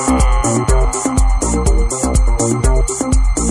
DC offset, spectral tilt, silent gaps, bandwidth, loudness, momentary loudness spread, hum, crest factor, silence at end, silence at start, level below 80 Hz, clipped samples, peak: under 0.1%; -5.5 dB/octave; none; 12.5 kHz; -15 LUFS; 2 LU; none; 12 dB; 0 s; 0 s; -14 dBFS; under 0.1%; -2 dBFS